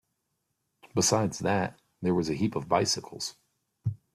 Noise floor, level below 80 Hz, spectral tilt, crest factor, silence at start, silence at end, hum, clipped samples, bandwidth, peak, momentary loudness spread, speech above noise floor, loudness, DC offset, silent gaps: -80 dBFS; -62 dBFS; -4 dB/octave; 20 dB; 0.85 s; 0.2 s; none; under 0.1%; 14.5 kHz; -10 dBFS; 12 LU; 52 dB; -29 LUFS; under 0.1%; none